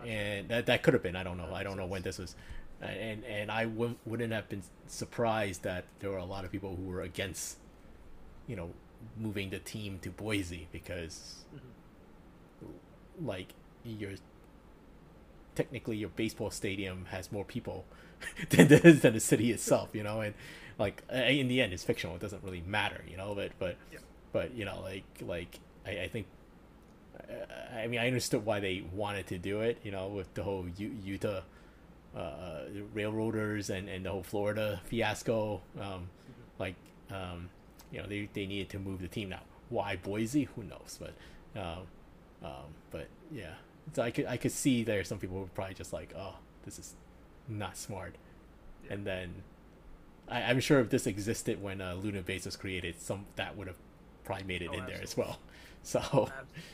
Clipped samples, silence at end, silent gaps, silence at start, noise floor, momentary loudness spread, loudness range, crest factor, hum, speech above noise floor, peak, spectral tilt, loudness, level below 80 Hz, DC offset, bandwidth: under 0.1%; 0 s; none; 0 s; -57 dBFS; 18 LU; 16 LU; 30 dB; none; 23 dB; -4 dBFS; -5 dB/octave; -34 LUFS; -56 dBFS; under 0.1%; 15.5 kHz